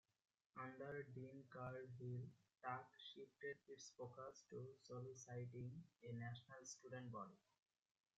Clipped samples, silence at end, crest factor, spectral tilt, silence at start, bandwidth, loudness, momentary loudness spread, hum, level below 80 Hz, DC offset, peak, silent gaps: under 0.1%; 0.8 s; 20 dB; -5.5 dB/octave; 0.55 s; 7.6 kHz; -56 LUFS; 6 LU; none; -86 dBFS; under 0.1%; -36 dBFS; none